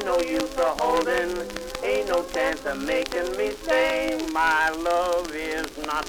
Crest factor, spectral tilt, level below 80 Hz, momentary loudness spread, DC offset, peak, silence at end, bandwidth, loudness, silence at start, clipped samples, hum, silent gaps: 18 dB; -3 dB/octave; -46 dBFS; 7 LU; under 0.1%; -8 dBFS; 0 s; over 20 kHz; -25 LUFS; 0 s; under 0.1%; none; none